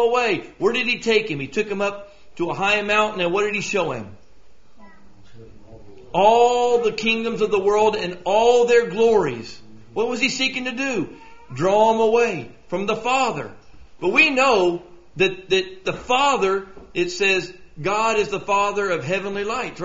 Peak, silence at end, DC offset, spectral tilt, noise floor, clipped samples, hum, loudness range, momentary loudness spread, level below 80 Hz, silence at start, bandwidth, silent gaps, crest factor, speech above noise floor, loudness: -2 dBFS; 0 s; 0.8%; -2 dB/octave; -53 dBFS; under 0.1%; none; 4 LU; 12 LU; -52 dBFS; 0 s; 7.8 kHz; none; 18 dB; 33 dB; -20 LUFS